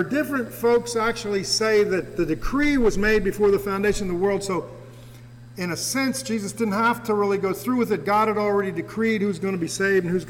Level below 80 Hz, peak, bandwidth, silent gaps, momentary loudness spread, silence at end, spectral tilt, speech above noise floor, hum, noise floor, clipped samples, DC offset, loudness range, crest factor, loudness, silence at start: -40 dBFS; -12 dBFS; 18.5 kHz; none; 7 LU; 0 s; -4.5 dB/octave; 21 dB; none; -43 dBFS; under 0.1%; under 0.1%; 4 LU; 10 dB; -23 LUFS; 0 s